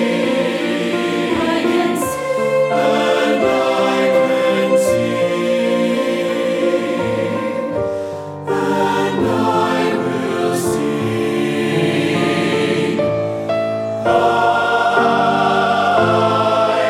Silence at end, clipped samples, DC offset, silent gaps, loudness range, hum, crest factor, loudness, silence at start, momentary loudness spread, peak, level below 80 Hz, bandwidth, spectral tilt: 0 s; under 0.1%; under 0.1%; none; 3 LU; none; 14 dB; -16 LUFS; 0 s; 5 LU; -2 dBFS; -52 dBFS; 16 kHz; -5.5 dB/octave